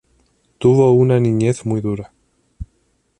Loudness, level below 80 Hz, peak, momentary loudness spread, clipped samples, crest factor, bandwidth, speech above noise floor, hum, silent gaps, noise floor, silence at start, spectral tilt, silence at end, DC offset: -16 LUFS; -44 dBFS; -2 dBFS; 25 LU; under 0.1%; 14 dB; 10.5 kHz; 49 dB; none; none; -63 dBFS; 0.6 s; -8.5 dB/octave; 0.55 s; under 0.1%